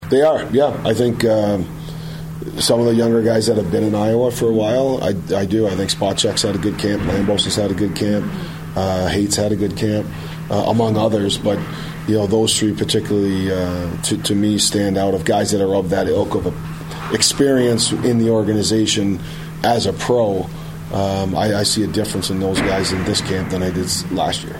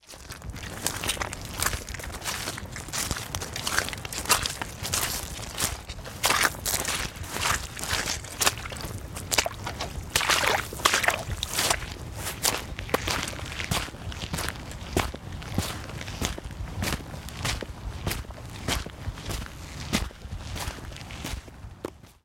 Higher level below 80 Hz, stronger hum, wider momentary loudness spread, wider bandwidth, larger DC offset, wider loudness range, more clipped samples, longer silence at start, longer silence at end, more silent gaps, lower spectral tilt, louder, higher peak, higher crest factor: about the same, -40 dBFS vs -42 dBFS; neither; second, 8 LU vs 14 LU; about the same, 16.5 kHz vs 17 kHz; neither; second, 2 LU vs 8 LU; neither; about the same, 0 s vs 0.05 s; second, 0 s vs 0.15 s; neither; first, -4.5 dB/octave vs -2 dB/octave; first, -18 LUFS vs -29 LUFS; about the same, -2 dBFS vs -2 dBFS; second, 16 dB vs 30 dB